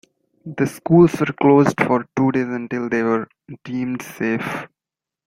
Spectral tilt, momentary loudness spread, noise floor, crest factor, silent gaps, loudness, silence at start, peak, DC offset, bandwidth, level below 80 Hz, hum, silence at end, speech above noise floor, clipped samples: -7.5 dB/octave; 15 LU; -88 dBFS; 18 dB; none; -19 LUFS; 0.45 s; -2 dBFS; under 0.1%; 16 kHz; -56 dBFS; none; 0.6 s; 69 dB; under 0.1%